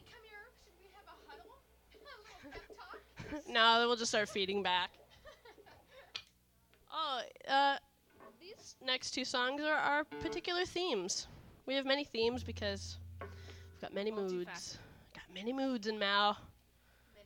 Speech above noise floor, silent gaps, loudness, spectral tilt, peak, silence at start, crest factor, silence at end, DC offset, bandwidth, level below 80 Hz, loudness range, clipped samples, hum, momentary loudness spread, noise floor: 34 dB; none; -35 LUFS; -2.5 dB/octave; -14 dBFS; 0 s; 24 dB; 0.05 s; under 0.1%; 19 kHz; -66 dBFS; 7 LU; under 0.1%; 60 Hz at -75 dBFS; 23 LU; -70 dBFS